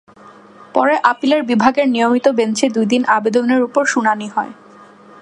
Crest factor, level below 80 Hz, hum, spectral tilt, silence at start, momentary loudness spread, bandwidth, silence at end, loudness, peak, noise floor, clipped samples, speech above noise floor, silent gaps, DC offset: 16 dB; -64 dBFS; none; -4.5 dB/octave; 0.75 s; 7 LU; 11 kHz; 0.7 s; -15 LUFS; 0 dBFS; -42 dBFS; under 0.1%; 27 dB; none; under 0.1%